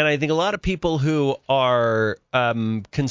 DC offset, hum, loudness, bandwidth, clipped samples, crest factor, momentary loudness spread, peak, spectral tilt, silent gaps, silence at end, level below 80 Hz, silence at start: under 0.1%; none; -21 LUFS; 7.6 kHz; under 0.1%; 16 dB; 5 LU; -6 dBFS; -6 dB/octave; none; 0 s; -44 dBFS; 0 s